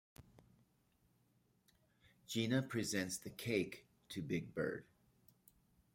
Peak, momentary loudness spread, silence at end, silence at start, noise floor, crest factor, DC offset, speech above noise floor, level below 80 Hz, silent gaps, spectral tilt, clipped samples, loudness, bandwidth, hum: -22 dBFS; 11 LU; 1.1 s; 0.2 s; -77 dBFS; 22 dB; under 0.1%; 36 dB; -76 dBFS; none; -4.5 dB/octave; under 0.1%; -42 LUFS; 16.5 kHz; none